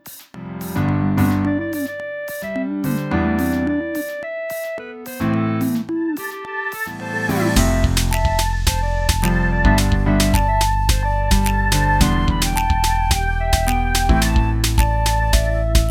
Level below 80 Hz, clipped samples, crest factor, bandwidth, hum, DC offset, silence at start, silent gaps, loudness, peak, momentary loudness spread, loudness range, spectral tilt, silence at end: -22 dBFS; under 0.1%; 18 dB; 18 kHz; none; under 0.1%; 0.05 s; none; -19 LUFS; 0 dBFS; 10 LU; 5 LU; -5 dB/octave; 0 s